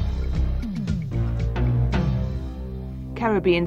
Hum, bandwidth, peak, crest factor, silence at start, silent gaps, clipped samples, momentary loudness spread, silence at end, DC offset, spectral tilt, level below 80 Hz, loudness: none; 7.2 kHz; -8 dBFS; 14 dB; 0 s; none; under 0.1%; 11 LU; 0 s; under 0.1%; -8.5 dB/octave; -28 dBFS; -25 LUFS